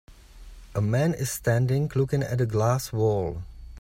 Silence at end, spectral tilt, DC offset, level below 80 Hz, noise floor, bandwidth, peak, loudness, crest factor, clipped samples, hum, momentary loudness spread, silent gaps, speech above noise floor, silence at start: 0 s; -6.5 dB/octave; under 0.1%; -46 dBFS; -46 dBFS; 16.5 kHz; -10 dBFS; -26 LUFS; 14 dB; under 0.1%; none; 9 LU; none; 21 dB; 0.1 s